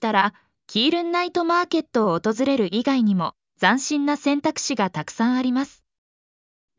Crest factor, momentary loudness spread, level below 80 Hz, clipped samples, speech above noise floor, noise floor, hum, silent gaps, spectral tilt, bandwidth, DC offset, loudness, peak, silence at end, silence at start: 18 dB; 5 LU; -68 dBFS; under 0.1%; over 69 dB; under -90 dBFS; none; none; -4.5 dB/octave; 7.6 kHz; under 0.1%; -22 LUFS; -4 dBFS; 1.1 s; 0 s